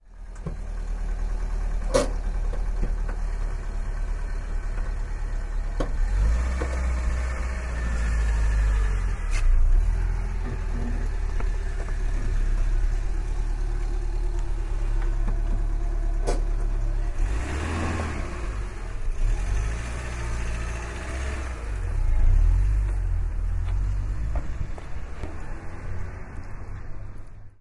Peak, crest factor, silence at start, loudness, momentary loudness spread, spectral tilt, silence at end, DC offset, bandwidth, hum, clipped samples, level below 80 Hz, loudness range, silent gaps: -8 dBFS; 18 dB; 0.05 s; -30 LUFS; 11 LU; -6 dB/octave; 0.1 s; under 0.1%; 11 kHz; none; under 0.1%; -24 dBFS; 5 LU; none